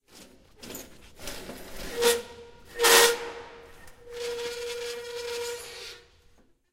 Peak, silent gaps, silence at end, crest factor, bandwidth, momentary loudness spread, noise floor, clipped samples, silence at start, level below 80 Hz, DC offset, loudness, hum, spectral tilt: -4 dBFS; none; 0.75 s; 26 dB; 16 kHz; 25 LU; -60 dBFS; under 0.1%; 0.15 s; -54 dBFS; under 0.1%; -25 LUFS; none; 0 dB/octave